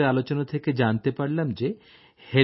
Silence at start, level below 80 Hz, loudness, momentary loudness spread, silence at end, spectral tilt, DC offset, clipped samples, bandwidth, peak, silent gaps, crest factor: 0 s; -64 dBFS; -26 LUFS; 7 LU; 0 s; -11 dB/octave; under 0.1%; under 0.1%; 5.8 kHz; -4 dBFS; none; 20 dB